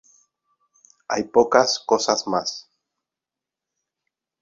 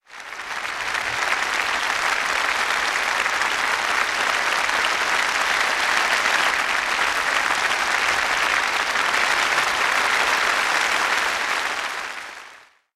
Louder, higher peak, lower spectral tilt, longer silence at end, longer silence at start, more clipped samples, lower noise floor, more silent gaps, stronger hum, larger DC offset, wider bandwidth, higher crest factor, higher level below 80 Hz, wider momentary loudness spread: about the same, -20 LUFS vs -20 LUFS; first, 0 dBFS vs -4 dBFS; first, -2.5 dB/octave vs 0.5 dB/octave; first, 1.8 s vs 0.35 s; first, 1.1 s vs 0.1 s; neither; first, -88 dBFS vs -47 dBFS; neither; neither; neither; second, 7.8 kHz vs 16 kHz; first, 24 dB vs 18 dB; second, -64 dBFS vs -54 dBFS; first, 12 LU vs 7 LU